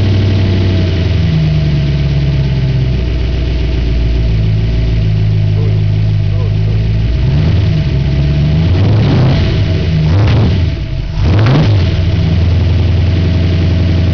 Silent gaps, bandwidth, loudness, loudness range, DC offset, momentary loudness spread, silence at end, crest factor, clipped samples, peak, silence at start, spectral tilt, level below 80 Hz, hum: none; 5.4 kHz; -12 LUFS; 2 LU; 4%; 5 LU; 0 s; 6 dB; under 0.1%; -2 dBFS; 0 s; -8.5 dB/octave; -18 dBFS; none